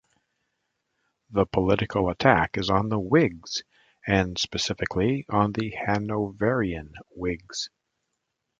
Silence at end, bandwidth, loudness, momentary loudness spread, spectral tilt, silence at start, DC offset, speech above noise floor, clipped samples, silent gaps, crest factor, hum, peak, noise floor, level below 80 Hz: 0.9 s; 9 kHz; -25 LUFS; 11 LU; -5.5 dB/octave; 1.3 s; under 0.1%; 55 dB; under 0.1%; none; 24 dB; none; -2 dBFS; -80 dBFS; -46 dBFS